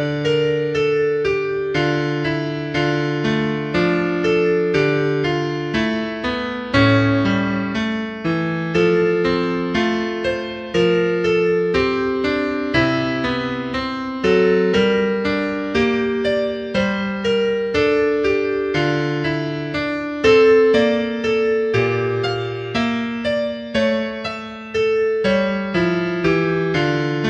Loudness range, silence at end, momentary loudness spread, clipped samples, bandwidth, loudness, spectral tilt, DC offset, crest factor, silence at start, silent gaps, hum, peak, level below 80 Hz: 3 LU; 0 s; 7 LU; under 0.1%; 8.4 kHz; -19 LUFS; -6.5 dB/octave; under 0.1%; 16 dB; 0 s; none; none; -2 dBFS; -44 dBFS